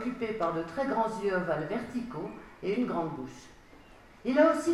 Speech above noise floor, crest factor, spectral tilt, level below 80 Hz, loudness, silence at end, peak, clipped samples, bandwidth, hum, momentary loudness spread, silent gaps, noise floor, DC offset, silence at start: 24 dB; 20 dB; -6 dB/octave; -60 dBFS; -31 LUFS; 0 s; -12 dBFS; under 0.1%; 13 kHz; none; 16 LU; none; -54 dBFS; under 0.1%; 0 s